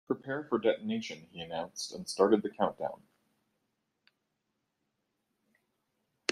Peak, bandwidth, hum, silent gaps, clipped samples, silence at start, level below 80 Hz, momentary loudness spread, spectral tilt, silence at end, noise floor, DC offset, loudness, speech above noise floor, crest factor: -10 dBFS; 13 kHz; none; none; under 0.1%; 0.1 s; -76 dBFS; 13 LU; -4.5 dB/octave; 0 s; -83 dBFS; under 0.1%; -33 LUFS; 50 dB; 26 dB